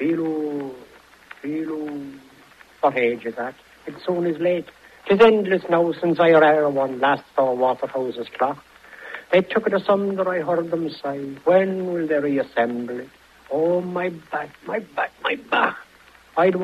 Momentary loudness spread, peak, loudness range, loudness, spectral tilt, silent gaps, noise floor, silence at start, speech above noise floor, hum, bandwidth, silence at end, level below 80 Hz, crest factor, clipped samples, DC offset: 16 LU; 0 dBFS; 8 LU; -21 LUFS; -7 dB/octave; none; -51 dBFS; 0 s; 30 dB; none; 13 kHz; 0 s; -64 dBFS; 22 dB; under 0.1%; under 0.1%